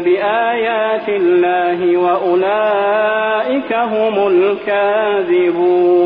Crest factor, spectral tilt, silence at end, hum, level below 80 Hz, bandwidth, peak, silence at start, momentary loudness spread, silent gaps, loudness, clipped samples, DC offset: 10 dB; -8.5 dB/octave; 0 s; none; -58 dBFS; 4.8 kHz; -4 dBFS; 0 s; 3 LU; none; -14 LUFS; under 0.1%; under 0.1%